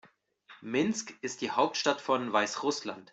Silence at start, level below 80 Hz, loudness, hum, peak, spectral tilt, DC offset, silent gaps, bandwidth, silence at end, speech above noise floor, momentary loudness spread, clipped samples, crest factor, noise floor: 0.05 s; -76 dBFS; -31 LUFS; none; -12 dBFS; -3 dB/octave; under 0.1%; none; 8.2 kHz; 0.1 s; 28 dB; 9 LU; under 0.1%; 20 dB; -59 dBFS